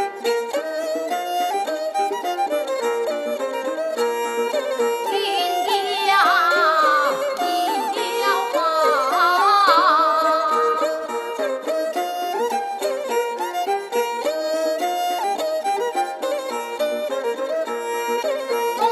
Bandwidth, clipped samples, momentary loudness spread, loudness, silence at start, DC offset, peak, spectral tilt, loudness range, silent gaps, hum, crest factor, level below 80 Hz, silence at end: 15.5 kHz; under 0.1%; 9 LU; -21 LUFS; 0 s; under 0.1%; -4 dBFS; -0.5 dB/octave; 6 LU; none; none; 16 dB; -74 dBFS; 0 s